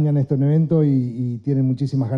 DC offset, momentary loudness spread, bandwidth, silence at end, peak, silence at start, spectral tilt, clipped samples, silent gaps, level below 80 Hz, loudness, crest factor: under 0.1%; 6 LU; 5.6 kHz; 0 s; -6 dBFS; 0 s; -11 dB/octave; under 0.1%; none; -56 dBFS; -19 LUFS; 12 dB